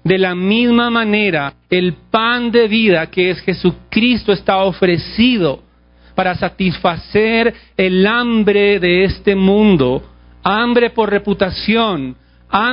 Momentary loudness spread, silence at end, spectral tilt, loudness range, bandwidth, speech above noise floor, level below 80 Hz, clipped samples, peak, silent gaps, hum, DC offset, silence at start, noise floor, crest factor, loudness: 6 LU; 0 s; -11 dB/octave; 3 LU; 5.4 kHz; 33 dB; -40 dBFS; under 0.1%; 0 dBFS; none; none; under 0.1%; 0.05 s; -47 dBFS; 14 dB; -14 LUFS